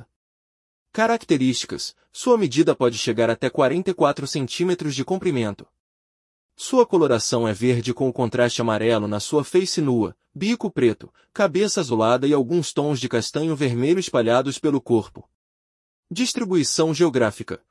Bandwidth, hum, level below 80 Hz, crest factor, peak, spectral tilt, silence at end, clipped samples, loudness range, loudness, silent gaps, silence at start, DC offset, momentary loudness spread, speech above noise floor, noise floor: 12 kHz; none; -64 dBFS; 18 dB; -4 dBFS; -5 dB/octave; 0.15 s; under 0.1%; 2 LU; -21 LUFS; 5.80-6.49 s, 15.35-16.03 s; 0.95 s; under 0.1%; 7 LU; over 69 dB; under -90 dBFS